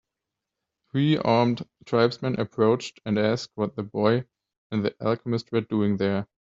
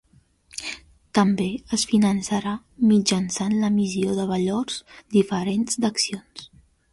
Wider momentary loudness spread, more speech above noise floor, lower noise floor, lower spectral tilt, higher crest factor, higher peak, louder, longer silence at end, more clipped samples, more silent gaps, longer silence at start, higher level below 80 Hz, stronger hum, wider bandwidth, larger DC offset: second, 7 LU vs 14 LU; first, 61 dB vs 35 dB; first, -86 dBFS vs -58 dBFS; first, -6 dB/octave vs -4.5 dB/octave; about the same, 20 dB vs 18 dB; about the same, -6 dBFS vs -6 dBFS; about the same, -25 LUFS vs -23 LUFS; second, 0.25 s vs 0.45 s; neither; first, 4.57-4.70 s vs none; first, 0.95 s vs 0.55 s; second, -64 dBFS vs -56 dBFS; neither; second, 7.8 kHz vs 11.5 kHz; neither